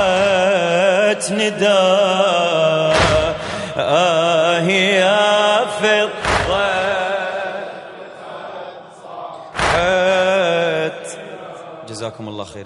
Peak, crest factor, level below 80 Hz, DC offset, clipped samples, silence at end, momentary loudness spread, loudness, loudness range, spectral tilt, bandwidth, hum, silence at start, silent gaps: -2 dBFS; 16 dB; -42 dBFS; under 0.1%; under 0.1%; 0 s; 19 LU; -15 LUFS; 7 LU; -3.5 dB/octave; 11.5 kHz; none; 0 s; none